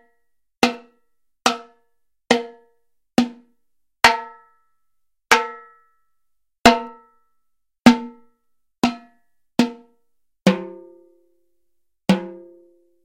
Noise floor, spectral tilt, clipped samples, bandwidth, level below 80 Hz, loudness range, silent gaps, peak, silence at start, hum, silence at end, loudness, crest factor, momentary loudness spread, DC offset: -75 dBFS; -4 dB/octave; under 0.1%; 16 kHz; -52 dBFS; 5 LU; none; 0 dBFS; 0.6 s; none; 0.7 s; -20 LUFS; 24 dB; 23 LU; under 0.1%